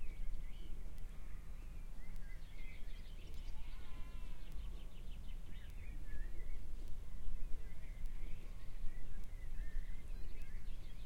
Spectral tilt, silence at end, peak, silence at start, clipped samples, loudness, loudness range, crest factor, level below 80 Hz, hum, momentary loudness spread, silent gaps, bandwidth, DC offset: -5.5 dB/octave; 0 s; -24 dBFS; 0 s; under 0.1%; -54 LUFS; 2 LU; 14 dB; -44 dBFS; none; 4 LU; none; 5 kHz; under 0.1%